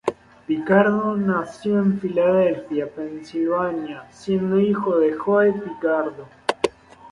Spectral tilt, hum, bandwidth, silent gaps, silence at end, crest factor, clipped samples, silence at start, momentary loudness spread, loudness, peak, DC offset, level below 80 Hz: -7.5 dB/octave; none; 11.5 kHz; none; 0.05 s; 18 dB; under 0.1%; 0.05 s; 12 LU; -21 LUFS; -2 dBFS; under 0.1%; -60 dBFS